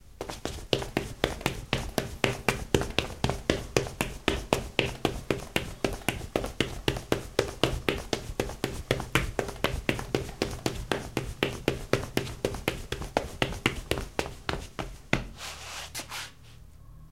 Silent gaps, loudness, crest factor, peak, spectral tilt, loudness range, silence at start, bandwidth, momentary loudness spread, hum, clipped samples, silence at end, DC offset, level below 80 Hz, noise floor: none; -31 LUFS; 28 dB; -4 dBFS; -4.5 dB/octave; 3 LU; 0 s; 17 kHz; 9 LU; none; under 0.1%; 0 s; 0.2%; -42 dBFS; -51 dBFS